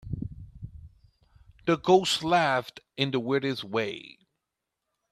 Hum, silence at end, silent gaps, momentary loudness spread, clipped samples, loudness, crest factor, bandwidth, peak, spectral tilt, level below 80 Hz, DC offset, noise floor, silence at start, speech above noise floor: none; 1.05 s; none; 22 LU; under 0.1%; -27 LUFS; 22 dB; 14 kHz; -6 dBFS; -4.5 dB/octave; -54 dBFS; under 0.1%; -85 dBFS; 0.05 s; 59 dB